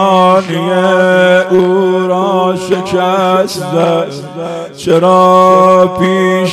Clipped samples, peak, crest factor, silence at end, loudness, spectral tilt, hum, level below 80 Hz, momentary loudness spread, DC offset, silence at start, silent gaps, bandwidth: 1%; 0 dBFS; 10 dB; 0 s; -9 LUFS; -6 dB/octave; none; -52 dBFS; 10 LU; under 0.1%; 0 s; none; 13.5 kHz